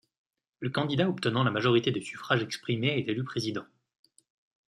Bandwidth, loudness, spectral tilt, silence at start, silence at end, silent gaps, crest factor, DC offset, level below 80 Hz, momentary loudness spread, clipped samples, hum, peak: 12.5 kHz; -29 LUFS; -6 dB/octave; 0.6 s; 1.05 s; none; 22 dB; under 0.1%; -68 dBFS; 9 LU; under 0.1%; none; -10 dBFS